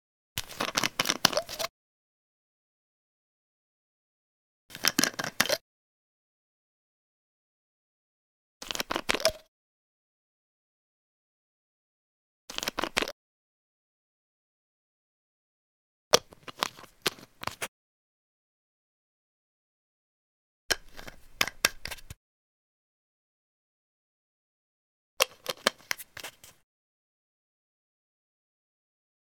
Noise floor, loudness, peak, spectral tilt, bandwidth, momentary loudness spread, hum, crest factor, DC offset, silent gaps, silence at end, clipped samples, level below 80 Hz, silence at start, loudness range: under -90 dBFS; -30 LUFS; 0 dBFS; -1 dB/octave; 19.5 kHz; 16 LU; none; 36 dB; under 0.1%; 1.70-4.69 s, 5.61-8.60 s, 9.48-12.48 s, 13.12-16.11 s, 17.68-20.69 s, 22.17-25.17 s; 2.75 s; under 0.1%; -62 dBFS; 0.35 s; 9 LU